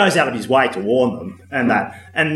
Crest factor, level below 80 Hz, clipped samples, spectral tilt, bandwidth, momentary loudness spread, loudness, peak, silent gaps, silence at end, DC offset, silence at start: 16 dB; -60 dBFS; under 0.1%; -5 dB/octave; 13.5 kHz; 8 LU; -18 LUFS; 0 dBFS; none; 0 s; under 0.1%; 0 s